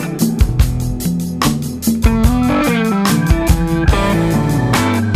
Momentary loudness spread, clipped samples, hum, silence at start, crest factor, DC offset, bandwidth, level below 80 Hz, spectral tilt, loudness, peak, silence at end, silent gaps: 4 LU; under 0.1%; none; 0 s; 14 dB; under 0.1%; 15.5 kHz; -20 dBFS; -6 dB/octave; -15 LUFS; 0 dBFS; 0 s; none